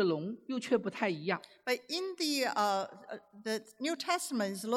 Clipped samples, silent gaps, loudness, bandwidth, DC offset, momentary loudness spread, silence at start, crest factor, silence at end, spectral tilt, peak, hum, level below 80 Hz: under 0.1%; none; -34 LUFS; 16.5 kHz; under 0.1%; 8 LU; 0 s; 18 dB; 0 s; -3.5 dB/octave; -18 dBFS; none; -86 dBFS